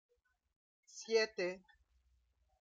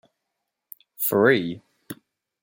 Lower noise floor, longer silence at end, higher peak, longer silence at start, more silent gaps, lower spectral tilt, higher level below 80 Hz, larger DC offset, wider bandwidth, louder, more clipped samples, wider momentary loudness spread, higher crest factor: second, -77 dBFS vs -81 dBFS; first, 1 s vs 0.5 s; second, -22 dBFS vs -4 dBFS; about the same, 0.95 s vs 1 s; neither; second, -2.5 dB/octave vs -5 dB/octave; second, -80 dBFS vs -68 dBFS; neither; second, 7.8 kHz vs 16.5 kHz; second, -37 LUFS vs -21 LUFS; neither; second, 19 LU vs 23 LU; about the same, 22 dB vs 22 dB